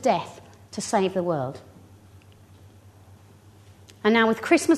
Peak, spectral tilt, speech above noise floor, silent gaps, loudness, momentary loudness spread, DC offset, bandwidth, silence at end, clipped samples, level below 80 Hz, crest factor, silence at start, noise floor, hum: -4 dBFS; -4.5 dB/octave; 29 dB; none; -24 LUFS; 18 LU; under 0.1%; 13.5 kHz; 0 s; under 0.1%; -66 dBFS; 22 dB; 0 s; -51 dBFS; none